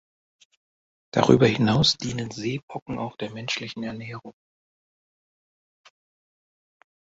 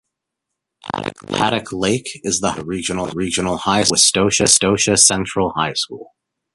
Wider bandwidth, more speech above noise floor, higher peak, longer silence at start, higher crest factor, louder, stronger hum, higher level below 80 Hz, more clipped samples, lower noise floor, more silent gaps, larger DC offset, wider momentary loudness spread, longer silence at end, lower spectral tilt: second, 8 kHz vs 12 kHz; first, over 66 dB vs 62 dB; about the same, -2 dBFS vs 0 dBFS; first, 1.15 s vs 0.85 s; first, 26 dB vs 18 dB; second, -24 LUFS vs -16 LUFS; neither; second, -54 dBFS vs -46 dBFS; neither; first, under -90 dBFS vs -80 dBFS; first, 2.63-2.68 s, 2.82-2.86 s vs none; neither; about the same, 16 LU vs 14 LU; first, 2.7 s vs 0.5 s; first, -5.5 dB/octave vs -2.5 dB/octave